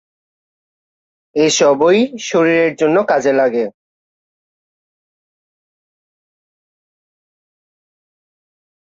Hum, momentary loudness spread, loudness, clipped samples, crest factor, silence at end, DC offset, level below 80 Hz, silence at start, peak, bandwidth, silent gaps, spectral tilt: none; 7 LU; -14 LUFS; under 0.1%; 16 dB; 5.2 s; under 0.1%; -64 dBFS; 1.35 s; -2 dBFS; 8 kHz; none; -4 dB/octave